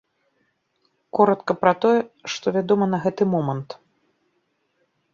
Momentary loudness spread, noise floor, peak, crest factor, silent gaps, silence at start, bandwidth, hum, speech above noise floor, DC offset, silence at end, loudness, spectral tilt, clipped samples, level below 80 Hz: 11 LU; -70 dBFS; -2 dBFS; 20 dB; none; 1.15 s; 7.4 kHz; none; 50 dB; under 0.1%; 1.4 s; -21 LUFS; -6.5 dB/octave; under 0.1%; -66 dBFS